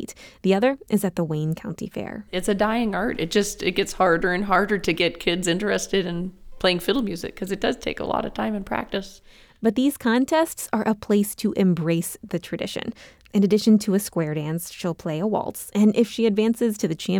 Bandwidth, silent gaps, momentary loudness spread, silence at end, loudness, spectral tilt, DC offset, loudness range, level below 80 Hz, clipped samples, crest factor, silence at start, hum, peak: 19.5 kHz; none; 10 LU; 0 s; -23 LUFS; -5 dB/octave; under 0.1%; 3 LU; -48 dBFS; under 0.1%; 16 dB; 0 s; none; -6 dBFS